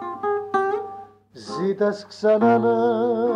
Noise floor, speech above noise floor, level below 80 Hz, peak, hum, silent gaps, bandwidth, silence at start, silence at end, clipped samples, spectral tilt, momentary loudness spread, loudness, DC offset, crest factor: -42 dBFS; 23 dB; -72 dBFS; -8 dBFS; none; none; 9.8 kHz; 0 s; 0 s; under 0.1%; -7 dB/octave; 17 LU; -21 LUFS; under 0.1%; 14 dB